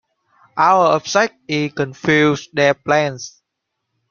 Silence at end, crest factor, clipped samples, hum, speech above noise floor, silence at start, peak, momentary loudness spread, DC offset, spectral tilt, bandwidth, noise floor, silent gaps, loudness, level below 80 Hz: 0.8 s; 16 dB; under 0.1%; none; 60 dB; 0.55 s; -2 dBFS; 10 LU; under 0.1%; -4.5 dB/octave; 7.2 kHz; -77 dBFS; none; -16 LUFS; -58 dBFS